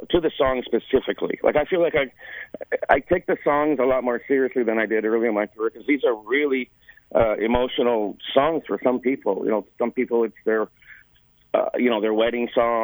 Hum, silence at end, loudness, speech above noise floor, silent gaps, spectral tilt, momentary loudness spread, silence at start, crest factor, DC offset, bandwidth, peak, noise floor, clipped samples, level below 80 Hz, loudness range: none; 0 s; -22 LUFS; 37 dB; none; -8 dB/octave; 6 LU; 0 s; 20 dB; under 0.1%; over 20 kHz; -2 dBFS; -58 dBFS; under 0.1%; -48 dBFS; 2 LU